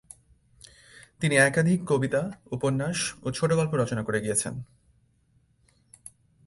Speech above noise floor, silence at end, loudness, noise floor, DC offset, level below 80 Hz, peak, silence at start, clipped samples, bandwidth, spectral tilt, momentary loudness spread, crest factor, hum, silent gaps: 40 dB; 1.8 s; -26 LUFS; -66 dBFS; under 0.1%; -58 dBFS; -8 dBFS; 1.2 s; under 0.1%; 11.5 kHz; -5 dB/octave; 14 LU; 20 dB; none; none